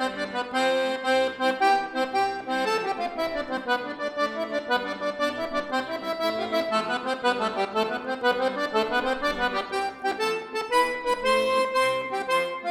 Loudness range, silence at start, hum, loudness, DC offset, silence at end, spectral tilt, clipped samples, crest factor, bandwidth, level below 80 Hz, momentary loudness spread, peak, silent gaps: 3 LU; 0 s; none; -26 LUFS; under 0.1%; 0 s; -3 dB/octave; under 0.1%; 18 dB; 16.5 kHz; -56 dBFS; 6 LU; -8 dBFS; none